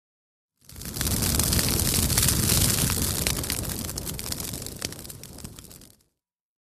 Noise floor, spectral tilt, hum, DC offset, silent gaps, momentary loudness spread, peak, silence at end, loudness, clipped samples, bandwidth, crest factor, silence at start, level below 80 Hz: -80 dBFS; -3 dB/octave; none; under 0.1%; none; 19 LU; -4 dBFS; 0.85 s; -24 LUFS; under 0.1%; 15.5 kHz; 24 dB; 0.7 s; -36 dBFS